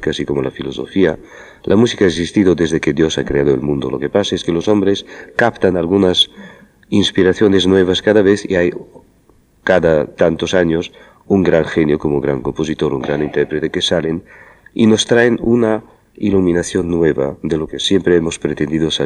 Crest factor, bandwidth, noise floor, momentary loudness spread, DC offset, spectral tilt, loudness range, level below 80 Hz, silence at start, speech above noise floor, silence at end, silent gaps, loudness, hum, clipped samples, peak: 14 dB; 11 kHz; -51 dBFS; 8 LU; under 0.1%; -5.5 dB/octave; 3 LU; -40 dBFS; 0 s; 37 dB; 0 s; none; -15 LUFS; none; under 0.1%; 0 dBFS